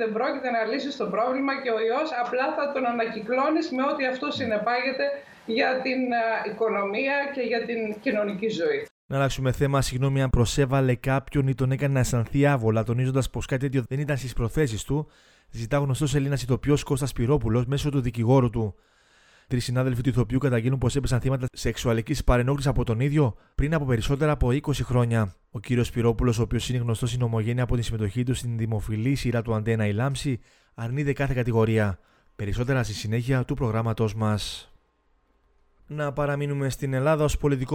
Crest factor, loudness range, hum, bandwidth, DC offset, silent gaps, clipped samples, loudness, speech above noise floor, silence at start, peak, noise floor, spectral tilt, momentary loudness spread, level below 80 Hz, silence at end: 18 dB; 3 LU; none; 16 kHz; under 0.1%; 8.91-9.09 s; under 0.1%; -25 LUFS; 42 dB; 0 s; -6 dBFS; -66 dBFS; -6.5 dB/octave; 6 LU; -40 dBFS; 0 s